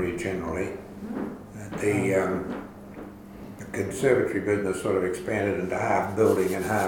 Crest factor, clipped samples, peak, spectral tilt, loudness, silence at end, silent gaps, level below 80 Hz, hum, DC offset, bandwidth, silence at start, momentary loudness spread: 18 dB; under 0.1%; -8 dBFS; -6 dB/octave; -26 LUFS; 0 s; none; -52 dBFS; none; under 0.1%; 18 kHz; 0 s; 19 LU